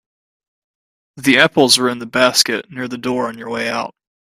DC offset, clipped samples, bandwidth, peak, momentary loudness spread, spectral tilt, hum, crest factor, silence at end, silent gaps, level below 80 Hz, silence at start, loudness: under 0.1%; under 0.1%; 16 kHz; 0 dBFS; 12 LU; -2.5 dB/octave; none; 18 dB; 0.45 s; none; -60 dBFS; 1.15 s; -15 LUFS